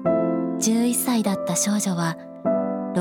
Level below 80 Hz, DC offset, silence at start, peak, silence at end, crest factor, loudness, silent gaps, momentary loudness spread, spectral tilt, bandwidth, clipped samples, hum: -64 dBFS; under 0.1%; 0 s; -8 dBFS; 0 s; 14 dB; -23 LUFS; none; 5 LU; -4.5 dB/octave; 18.5 kHz; under 0.1%; none